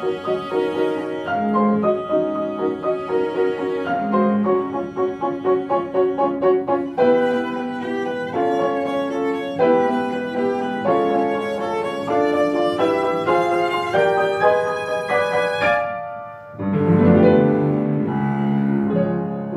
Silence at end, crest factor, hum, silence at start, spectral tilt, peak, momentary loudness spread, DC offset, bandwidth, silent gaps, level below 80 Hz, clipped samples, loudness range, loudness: 0 s; 18 dB; none; 0 s; -7.5 dB/octave; -2 dBFS; 7 LU; under 0.1%; 12 kHz; none; -56 dBFS; under 0.1%; 3 LU; -20 LUFS